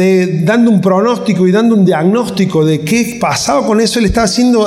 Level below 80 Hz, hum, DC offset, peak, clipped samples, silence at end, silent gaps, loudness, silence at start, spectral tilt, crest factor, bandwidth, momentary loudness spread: -34 dBFS; none; under 0.1%; -2 dBFS; under 0.1%; 0 s; none; -11 LUFS; 0 s; -5.5 dB/octave; 8 dB; 16 kHz; 4 LU